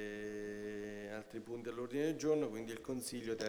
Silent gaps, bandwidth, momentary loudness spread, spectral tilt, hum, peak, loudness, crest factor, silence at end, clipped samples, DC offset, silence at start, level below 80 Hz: none; over 20 kHz; 11 LU; -5 dB/octave; none; -24 dBFS; -42 LUFS; 18 dB; 0 s; under 0.1%; under 0.1%; 0 s; -72 dBFS